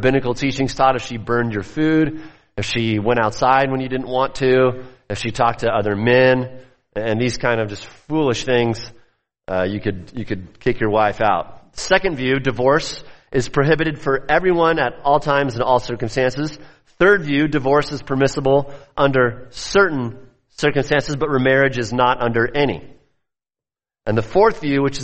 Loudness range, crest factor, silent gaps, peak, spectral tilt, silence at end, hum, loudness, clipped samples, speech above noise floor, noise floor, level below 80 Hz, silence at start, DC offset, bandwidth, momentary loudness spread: 3 LU; 18 dB; none; -2 dBFS; -5.5 dB/octave; 0 s; none; -18 LUFS; under 0.1%; over 72 dB; under -90 dBFS; -40 dBFS; 0 s; under 0.1%; 8.8 kHz; 12 LU